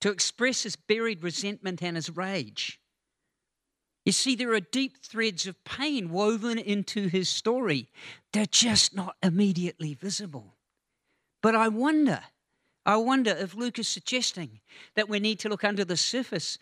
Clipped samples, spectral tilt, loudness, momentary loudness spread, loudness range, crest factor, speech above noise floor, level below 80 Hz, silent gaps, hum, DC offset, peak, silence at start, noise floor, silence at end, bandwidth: under 0.1%; -3.5 dB/octave; -27 LUFS; 10 LU; 5 LU; 22 dB; 57 dB; -68 dBFS; none; none; under 0.1%; -8 dBFS; 0 s; -85 dBFS; 0.05 s; 13 kHz